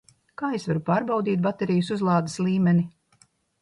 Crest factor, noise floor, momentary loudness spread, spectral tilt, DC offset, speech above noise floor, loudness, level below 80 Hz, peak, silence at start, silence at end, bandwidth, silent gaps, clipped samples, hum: 14 dB; -62 dBFS; 8 LU; -7.5 dB/octave; under 0.1%; 39 dB; -24 LUFS; -62 dBFS; -10 dBFS; 0.4 s; 0.7 s; 11 kHz; none; under 0.1%; none